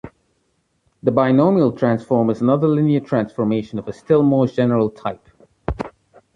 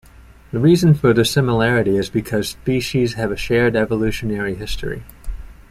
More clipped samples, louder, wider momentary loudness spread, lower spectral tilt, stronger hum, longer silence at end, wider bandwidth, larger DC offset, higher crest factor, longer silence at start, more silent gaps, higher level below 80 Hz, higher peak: neither; about the same, -18 LUFS vs -18 LUFS; about the same, 15 LU vs 15 LU; first, -9.5 dB/octave vs -6 dB/octave; neither; first, 0.45 s vs 0.1 s; second, 7.6 kHz vs 15.5 kHz; neither; about the same, 16 dB vs 16 dB; second, 0.05 s vs 0.2 s; neither; second, -44 dBFS vs -36 dBFS; about the same, -2 dBFS vs -2 dBFS